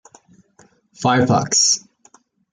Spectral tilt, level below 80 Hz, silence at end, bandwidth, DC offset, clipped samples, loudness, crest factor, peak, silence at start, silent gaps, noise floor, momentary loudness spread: -3 dB/octave; -60 dBFS; 0.75 s; 11 kHz; under 0.1%; under 0.1%; -16 LUFS; 18 dB; -2 dBFS; 1 s; none; -55 dBFS; 7 LU